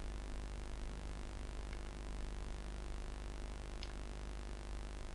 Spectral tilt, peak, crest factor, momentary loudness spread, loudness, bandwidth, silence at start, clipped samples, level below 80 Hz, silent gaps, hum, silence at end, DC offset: -5 dB/octave; -30 dBFS; 14 dB; 1 LU; -49 LUFS; 11.5 kHz; 0 s; under 0.1%; -46 dBFS; none; none; 0 s; under 0.1%